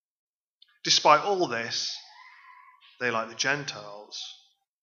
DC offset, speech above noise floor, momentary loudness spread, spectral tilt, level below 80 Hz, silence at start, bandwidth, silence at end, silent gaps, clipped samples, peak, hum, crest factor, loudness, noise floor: under 0.1%; 38 dB; 20 LU; -2 dB/octave; -86 dBFS; 0.85 s; 7.6 kHz; 0.5 s; none; under 0.1%; -4 dBFS; none; 26 dB; -25 LUFS; -64 dBFS